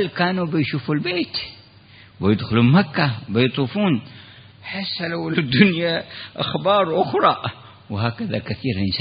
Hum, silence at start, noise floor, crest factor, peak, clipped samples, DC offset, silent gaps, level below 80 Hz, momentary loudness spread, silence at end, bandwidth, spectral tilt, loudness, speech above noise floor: none; 0 s; -47 dBFS; 20 dB; 0 dBFS; under 0.1%; under 0.1%; none; -54 dBFS; 12 LU; 0 s; 5.2 kHz; -11.5 dB/octave; -20 LUFS; 27 dB